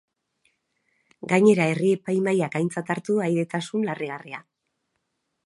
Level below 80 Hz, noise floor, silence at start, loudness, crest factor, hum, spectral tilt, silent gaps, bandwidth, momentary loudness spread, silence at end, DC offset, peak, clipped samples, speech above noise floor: -74 dBFS; -77 dBFS; 1.25 s; -23 LUFS; 20 dB; none; -6.5 dB/octave; none; 11.5 kHz; 16 LU; 1.05 s; under 0.1%; -4 dBFS; under 0.1%; 54 dB